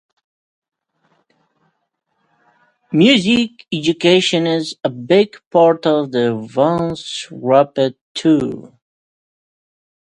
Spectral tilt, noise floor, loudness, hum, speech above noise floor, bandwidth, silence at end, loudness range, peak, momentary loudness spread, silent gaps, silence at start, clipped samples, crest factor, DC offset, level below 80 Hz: -5.5 dB/octave; -70 dBFS; -16 LUFS; none; 55 dB; 10.5 kHz; 1.55 s; 5 LU; 0 dBFS; 10 LU; 5.46-5.51 s, 8.01-8.15 s; 2.9 s; under 0.1%; 18 dB; under 0.1%; -58 dBFS